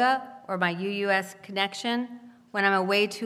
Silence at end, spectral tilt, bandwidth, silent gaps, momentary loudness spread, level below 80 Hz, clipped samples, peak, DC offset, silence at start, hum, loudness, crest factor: 0 s; -4.5 dB/octave; 15.5 kHz; none; 11 LU; -80 dBFS; under 0.1%; -8 dBFS; under 0.1%; 0 s; none; -27 LUFS; 20 dB